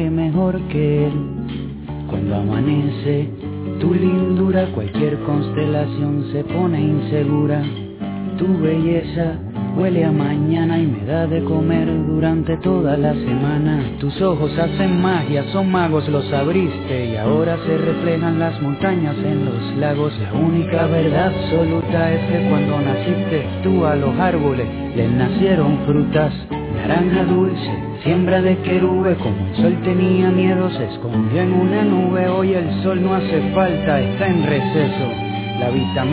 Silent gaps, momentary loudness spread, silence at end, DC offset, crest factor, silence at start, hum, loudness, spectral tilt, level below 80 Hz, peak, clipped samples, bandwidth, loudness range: none; 6 LU; 0 s; under 0.1%; 14 dB; 0 s; none; -18 LUFS; -12 dB/octave; -38 dBFS; -4 dBFS; under 0.1%; 4 kHz; 2 LU